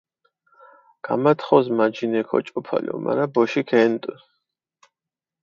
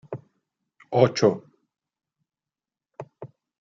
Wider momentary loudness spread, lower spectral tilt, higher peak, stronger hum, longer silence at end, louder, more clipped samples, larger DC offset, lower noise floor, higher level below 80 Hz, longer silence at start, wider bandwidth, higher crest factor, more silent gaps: second, 9 LU vs 25 LU; about the same, -7 dB/octave vs -6 dB/octave; about the same, -2 dBFS vs -2 dBFS; neither; first, 1.3 s vs 0.35 s; about the same, -21 LUFS vs -22 LUFS; neither; neither; about the same, -88 dBFS vs under -90 dBFS; about the same, -70 dBFS vs -72 dBFS; first, 1.05 s vs 0.1 s; about the same, 7.2 kHz vs 7.6 kHz; second, 20 dB vs 26 dB; neither